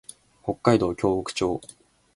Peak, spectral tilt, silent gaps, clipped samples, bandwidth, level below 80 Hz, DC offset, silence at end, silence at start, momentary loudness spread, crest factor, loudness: -2 dBFS; -6 dB/octave; none; under 0.1%; 11.5 kHz; -50 dBFS; under 0.1%; 0.5 s; 0.45 s; 13 LU; 24 dB; -25 LUFS